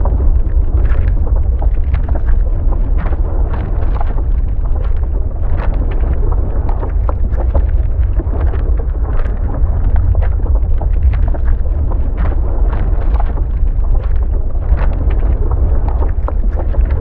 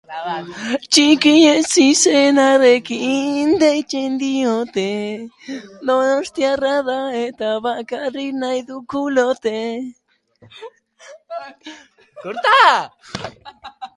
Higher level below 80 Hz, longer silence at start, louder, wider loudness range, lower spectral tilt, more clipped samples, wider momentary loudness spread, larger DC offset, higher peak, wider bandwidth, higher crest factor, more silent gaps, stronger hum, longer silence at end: first, -12 dBFS vs -60 dBFS; about the same, 0 s vs 0.1 s; about the same, -17 LUFS vs -16 LUFS; second, 2 LU vs 11 LU; first, -11.5 dB/octave vs -2.5 dB/octave; neither; second, 3 LU vs 20 LU; neither; about the same, 0 dBFS vs 0 dBFS; second, 3.1 kHz vs 11.5 kHz; second, 12 dB vs 18 dB; neither; neither; about the same, 0 s vs 0.1 s